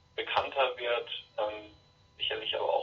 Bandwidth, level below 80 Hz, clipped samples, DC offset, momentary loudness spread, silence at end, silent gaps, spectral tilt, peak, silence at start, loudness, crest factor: 7 kHz; -68 dBFS; under 0.1%; under 0.1%; 7 LU; 0 s; none; -4 dB/octave; -14 dBFS; 0.15 s; -32 LUFS; 20 dB